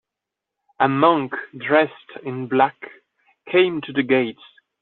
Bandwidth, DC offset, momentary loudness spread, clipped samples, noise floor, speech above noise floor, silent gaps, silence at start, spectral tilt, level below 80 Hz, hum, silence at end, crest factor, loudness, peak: 4.2 kHz; under 0.1%; 14 LU; under 0.1%; -85 dBFS; 65 dB; none; 0.8 s; -3.5 dB/octave; -68 dBFS; none; 0.5 s; 18 dB; -20 LUFS; -4 dBFS